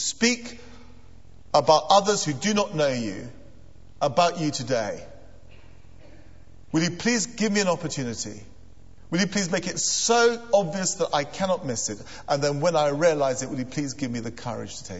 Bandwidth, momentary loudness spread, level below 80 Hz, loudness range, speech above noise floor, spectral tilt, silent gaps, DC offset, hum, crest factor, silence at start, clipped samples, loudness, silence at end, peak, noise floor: 8.2 kHz; 14 LU; -54 dBFS; 5 LU; 26 dB; -3.5 dB/octave; none; 0.7%; none; 22 dB; 0 s; under 0.1%; -24 LUFS; 0 s; -4 dBFS; -50 dBFS